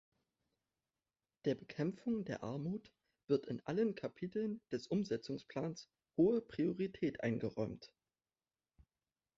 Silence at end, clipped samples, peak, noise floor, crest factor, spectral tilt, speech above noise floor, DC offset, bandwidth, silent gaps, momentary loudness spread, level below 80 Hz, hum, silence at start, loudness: 1.5 s; under 0.1%; -22 dBFS; under -90 dBFS; 20 dB; -7 dB/octave; over 51 dB; under 0.1%; 7.6 kHz; none; 9 LU; -74 dBFS; none; 1.45 s; -40 LUFS